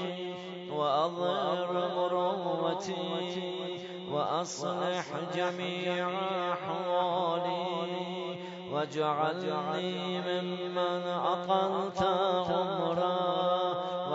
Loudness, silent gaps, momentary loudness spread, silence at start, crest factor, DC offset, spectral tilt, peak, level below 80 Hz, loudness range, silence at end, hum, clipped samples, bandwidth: -32 LUFS; none; 7 LU; 0 s; 16 dB; under 0.1%; -3.5 dB/octave; -16 dBFS; -72 dBFS; 3 LU; 0 s; none; under 0.1%; 7.6 kHz